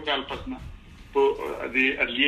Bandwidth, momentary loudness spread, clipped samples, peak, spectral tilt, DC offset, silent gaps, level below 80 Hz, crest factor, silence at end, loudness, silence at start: 13 kHz; 16 LU; under 0.1%; -6 dBFS; -4.5 dB/octave; under 0.1%; none; -46 dBFS; 20 dB; 0 s; -25 LUFS; 0 s